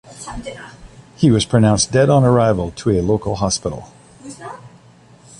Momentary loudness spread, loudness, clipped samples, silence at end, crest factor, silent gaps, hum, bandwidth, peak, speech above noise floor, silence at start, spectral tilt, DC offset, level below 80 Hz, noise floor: 21 LU; -16 LUFS; under 0.1%; 0.7 s; 16 dB; none; none; 11.5 kHz; -2 dBFS; 30 dB; 0.1 s; -5.5 dB/octave; under 0.1%; -38 dBFS; -46 dBFS